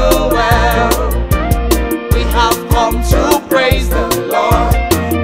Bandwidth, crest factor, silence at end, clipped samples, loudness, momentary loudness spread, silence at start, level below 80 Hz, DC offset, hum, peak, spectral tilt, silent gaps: 16.5 kHz; 12 dB; 0 s; under 0.1%; -13 LUFS; 4 LU; 0 s; -18 dBFS; under 0.1%; none; 0 dBFS; -5 dB/octave; none